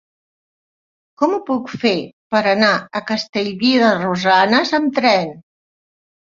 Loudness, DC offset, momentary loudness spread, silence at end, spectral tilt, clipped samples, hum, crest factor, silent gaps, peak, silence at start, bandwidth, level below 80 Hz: -16 LUFS; under 0.1%; 8 LU; 0.9 s; -5 dB/octave; under 0.1%; none; 16 dB; 2.13-2.30 s, 3.29-3.33 s; -2 dBFS; 1.2 s; 7.6 kHz; -62 dBFS